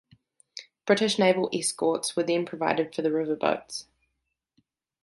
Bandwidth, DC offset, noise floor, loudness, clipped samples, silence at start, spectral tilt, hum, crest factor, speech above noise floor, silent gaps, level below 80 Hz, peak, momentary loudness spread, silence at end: 12 kHz; under 0.1%; -80 dBFS; -26 LUFS; under 0.1%; 0.55 s; -4 dB/octave; none; 20 dB; 55 dB; none; -74 dBFS; -8 dBFS; 16 LU; 1.2 s